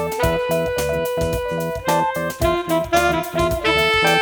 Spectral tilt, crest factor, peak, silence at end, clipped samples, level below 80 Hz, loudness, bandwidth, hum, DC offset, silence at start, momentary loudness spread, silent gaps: -4.5 dB/octave; 16 dB; -4 dBFS; 0 s; under 0.1%; -34 dBFS; -19 LUFS; over 20 kHz; none; under 0.1%; 0 s; 7 LU; none